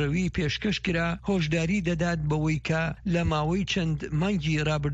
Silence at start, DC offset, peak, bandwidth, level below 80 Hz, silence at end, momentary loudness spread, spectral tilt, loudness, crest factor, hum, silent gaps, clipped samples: 0 s; under 0.1%; -14 dBFS; 8 kHz; -42 dBFS; 0 s; 2 LU; -6 dB/octave; -27 LUFS; 12 dB; none; none; under 0.1%